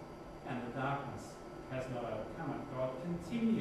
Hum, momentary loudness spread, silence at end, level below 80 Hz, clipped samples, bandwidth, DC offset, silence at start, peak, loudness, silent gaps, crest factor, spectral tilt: none; 11 LU; 0 s; -60 dBFS; under 0.1%; 13 kHz; under 0.1%; 0 s; -24 dBFS; -41 LUFS; none; 16 dB; -7 dB/octave